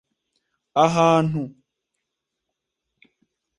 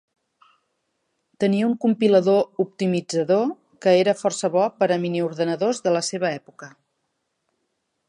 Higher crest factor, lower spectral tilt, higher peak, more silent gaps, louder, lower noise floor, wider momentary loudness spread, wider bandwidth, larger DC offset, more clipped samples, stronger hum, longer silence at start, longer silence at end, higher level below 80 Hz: about the same, 22 dB vs 18 dB; about the same, -6 dB/octave vs -5.5 dB/octave; about the same, -4 dBFS vs -6 dBFS; neither; about the same, -20 LUFS vs -21 LUFS; first, -82 dBFS vs -75 dBFS; first, 13 LU vs 7 LU; about the same, 11 kHz vs 11 kHz; neither; neither; neither; second, 0.75 s vs 1.4 s; first, 2.1 s vs 1.4 s; first, -62 dBFS vs -74 dBFS